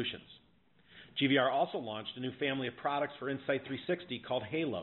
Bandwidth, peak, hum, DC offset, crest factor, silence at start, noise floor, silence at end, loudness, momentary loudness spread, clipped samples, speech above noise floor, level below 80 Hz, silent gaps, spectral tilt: 4.2 kHz; -16 dBFS; none; under 0.1%; 20 dB; 0 s; -68 dBFS; 0 s; -35 LUFS; 11 LU; under 0.1%; 34 dB; -74 dBFS; none; -3 dB/octave